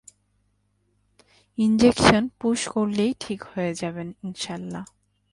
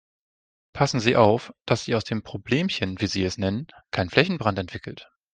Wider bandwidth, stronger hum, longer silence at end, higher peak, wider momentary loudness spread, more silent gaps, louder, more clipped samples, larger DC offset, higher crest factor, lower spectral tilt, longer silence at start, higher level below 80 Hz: first, 11.5 kHz vs 9.6 kHz; first, 50 Hz at -55 dBFS vs none; first, 0.45 s vs 0.3 s; about the same, 0 dBFS vs -2 dBFS; first, 17 LU vs 14 LU; neither; about the same, -23 LUFS vs -24 LUFS; neither; neither; about the same, 24 dB vs 24 dB; about the same, -5 dB/octave vs -5.5 dB/octave; first, 1.6 s vs 0.75 s; first, -50 dBFS vs -56 dBFS